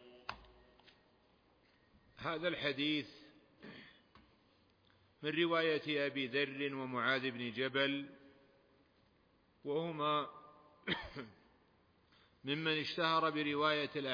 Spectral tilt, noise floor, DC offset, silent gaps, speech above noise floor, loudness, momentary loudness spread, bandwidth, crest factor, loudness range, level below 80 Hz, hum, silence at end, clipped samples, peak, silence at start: -2 dB/octave; -72 dBFS; under 0.1%; none; 35 dB; -37 LUFS; 18 LU; 5.2 kHz; 20 dB; 6 LU; -72 dBFS; none; 0 s; under 0.1%; -20 dBFS; 0 s